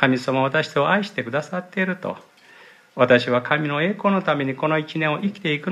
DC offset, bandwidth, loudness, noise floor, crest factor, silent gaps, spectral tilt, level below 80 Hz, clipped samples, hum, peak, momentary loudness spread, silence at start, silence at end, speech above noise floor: under 0.1%; 12 kHz; -21 LUFS; -49 dBFS; 22 dB; none; -6.5 dB/octave; -68 dBFS; under 0.1%; none; 0 dBFS; 9 LU; 0 s; 0 s; 28 dB